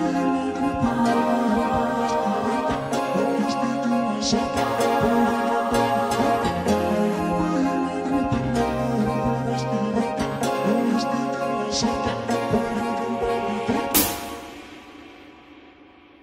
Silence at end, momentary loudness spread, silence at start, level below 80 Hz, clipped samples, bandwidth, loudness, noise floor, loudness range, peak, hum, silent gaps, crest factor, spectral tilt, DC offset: 0.55 s; 5 LU; 0 s; -46 dBFS; under 0.1%; 16 kHz; -23 LUFS; -50 dBFS; 3 LU; -4 dBFS; none; none; 18 dB; -5 dB/octave; under 0.1%